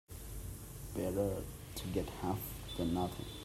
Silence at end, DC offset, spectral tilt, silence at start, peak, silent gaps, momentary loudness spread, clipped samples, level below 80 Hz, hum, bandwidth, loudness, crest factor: 0 s; under 0.1%; -6 dB/octave; 0.1 s; -22 dBFS; none; 11 LU; under 0.1%; -50 dBFS; none; 16 kHz; -40 LUFS; 18 dB